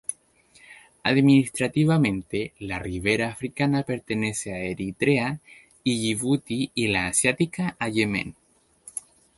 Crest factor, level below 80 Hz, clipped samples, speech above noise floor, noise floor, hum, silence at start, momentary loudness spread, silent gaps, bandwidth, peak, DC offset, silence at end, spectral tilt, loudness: 20 dB; -52 dBFS; under 0.1%; 34 dB; -58 dBFS; none; 0.1 s; 11 LU; none; 12 kHz; -6 dBFS; under 0.1%; 0.35 s; -5 dB/octave; -24 LUFS